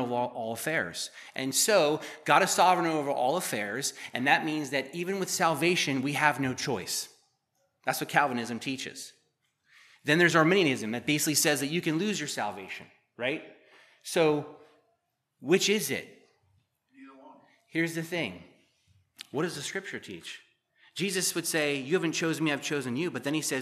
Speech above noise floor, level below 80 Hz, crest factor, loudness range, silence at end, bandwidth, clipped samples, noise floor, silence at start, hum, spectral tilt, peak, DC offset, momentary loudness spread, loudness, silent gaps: 49 dB; -78 dBFS; 24 dB; 9 LU; 0 s; 15 kHz; under 0.1%; -77 dBFS; 0 s; none; -3.5 dB/octave; -6 dBFS; under 0.1%; 14 LU; -28 LUFS; none